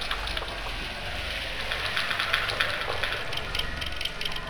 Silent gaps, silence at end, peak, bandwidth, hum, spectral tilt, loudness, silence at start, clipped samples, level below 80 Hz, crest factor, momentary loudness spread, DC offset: none; 0 s; -4 dBFS; over 20 kHz; none; -2.5 dB/octave; -29 LUFS; 0 s; under 0.1%; -40 dBFS; 26 dB; 7 LU; under 0.1%